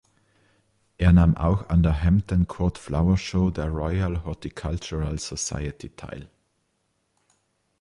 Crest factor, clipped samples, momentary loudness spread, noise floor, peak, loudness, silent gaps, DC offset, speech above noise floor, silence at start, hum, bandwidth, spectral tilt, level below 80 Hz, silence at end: 18 dB; under 0.1%; 15 LU; -72 dBFS; -6 dBFS; -24 LUFS; none; under 0.1%; 50 dB; 1 s; none; 11 kHz; -6.5 dB/octave; -32 dBFS; 1.55 s